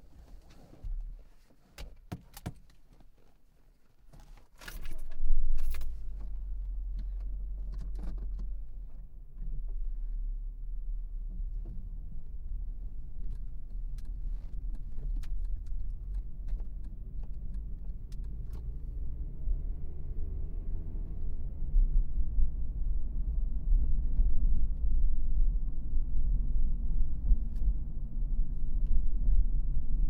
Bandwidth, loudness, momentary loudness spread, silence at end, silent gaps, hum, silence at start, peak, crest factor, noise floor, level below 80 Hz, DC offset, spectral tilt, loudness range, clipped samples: 1.8 kHz; -39 LUFS; 13 LU; 0 s; none; none; 0 s; -10 dBFS; 18 dB; -59 dBFS; -32 dBFS; under 0.1%; -7.5 dB/octave; 10 LU; under 0.1%